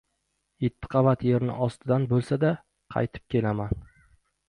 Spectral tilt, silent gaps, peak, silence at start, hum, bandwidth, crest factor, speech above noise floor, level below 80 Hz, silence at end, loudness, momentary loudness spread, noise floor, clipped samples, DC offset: -9 dB/octave; none; -10 dBFS; 0.6 s; none; 10.5 kHz; 18 dB; 52 dB; -48 dBFS; 0.65 s; -27 LUFS; 9 LU; -77 dBFS; under 0.1%; under 0.1%